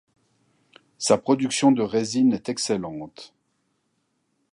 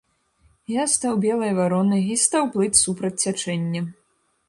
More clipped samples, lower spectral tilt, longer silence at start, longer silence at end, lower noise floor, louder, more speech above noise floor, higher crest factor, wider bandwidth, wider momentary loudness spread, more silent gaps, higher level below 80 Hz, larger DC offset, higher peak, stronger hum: neither; about the same, -4.5 dB/octave vs -4 dB/octave; first, 1 s vs 0.7 s; first, 1.25 s vs 0.55 s; first, -72 dBFS vs -67 dBFS; about the same, -22 LUFS vs -21 LUFS; first, 50 dB vs 45 dB; about the same, 20 dB vs 20 dB; about the same, 11.5 kHz vs 11.5 kHz; first, 13 LU vs 9 LU; neither; second, -66 dBFS vs -60 dBFS; neither; about the same, -4 dBFS vs -2 dBFS; neither